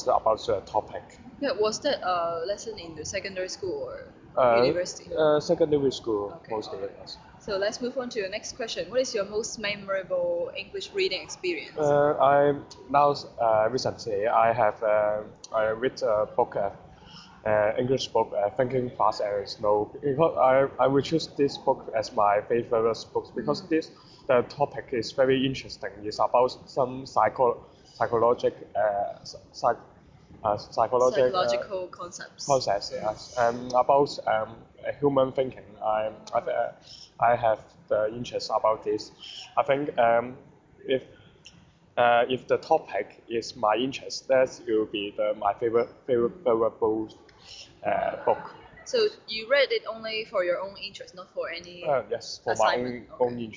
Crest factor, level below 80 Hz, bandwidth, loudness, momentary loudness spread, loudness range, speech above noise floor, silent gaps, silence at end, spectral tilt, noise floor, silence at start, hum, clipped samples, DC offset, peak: 20 dB; -60 dBFS; 7.6 kHz; -27 LUFS; 12 LU; 5 LU; 29 dB; none; 0 s; -4.5 dB/octave; -55 dBFS; 0 s; none; under 0.1%; under 0.1%; -8 dBFS